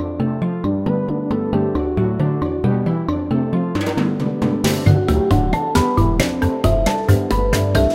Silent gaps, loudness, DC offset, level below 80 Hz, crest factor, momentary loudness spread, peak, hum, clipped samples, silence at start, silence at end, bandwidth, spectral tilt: none; -18 LUFS; under 0.1%; -26 dBFS; 16 dB; 5 LU; -2 dBFS; none; under 0.1%; 0 s; 0 s; 16.5 kHz; -7 dB/octave